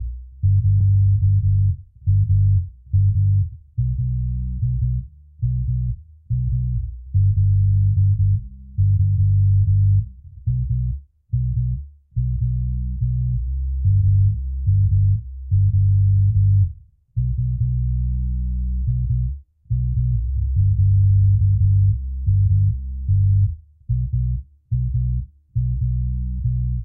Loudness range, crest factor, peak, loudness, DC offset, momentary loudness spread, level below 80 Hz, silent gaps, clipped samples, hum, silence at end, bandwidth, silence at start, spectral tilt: 6 LU; 10 dB; -8 dBFS; -20 LUFS; under 0.1%; 10 LU; -26 dBFS; none; under 0.1%; none; 0 s; 0.3 kHz; 0 s; -29 dB/octave